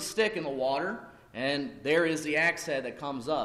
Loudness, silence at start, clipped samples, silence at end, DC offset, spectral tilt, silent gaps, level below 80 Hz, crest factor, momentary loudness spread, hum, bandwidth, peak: -30 LUFS; 0 s; under 0.1%; 0 s; under 0.1%; -3.5 dB/octave; none; -66 dBFS; 16 dB; 10 LU; none; 14.5 kHz; -14 dBFS